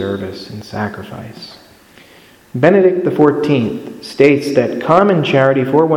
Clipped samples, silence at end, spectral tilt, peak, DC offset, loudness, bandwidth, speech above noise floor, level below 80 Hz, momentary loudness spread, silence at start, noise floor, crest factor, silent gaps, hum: under 0.1%; 0 s; -7.5 dB/octave; 0 dBFS; under 0.1%; -13 LUFS; 16.5 kHz; 30 dB; -54 dBFS; 18 LU; 0 s; -44 dBFS; 14 dB; none; none